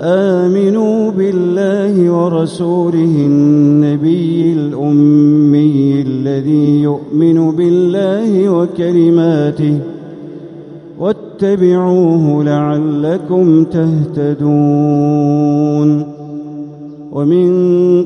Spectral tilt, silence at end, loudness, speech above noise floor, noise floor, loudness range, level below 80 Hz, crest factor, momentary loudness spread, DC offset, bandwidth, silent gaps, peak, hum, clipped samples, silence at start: -9.5 dB/octave; 0 s; -12 LUFS; 20 dB; -31 dBFS; 3 LU; -54 dBFS; 10 dB; 12 LU; under 0.1%; 10 kHz; none; 0 dBFS; none; under 0.1%; 0 s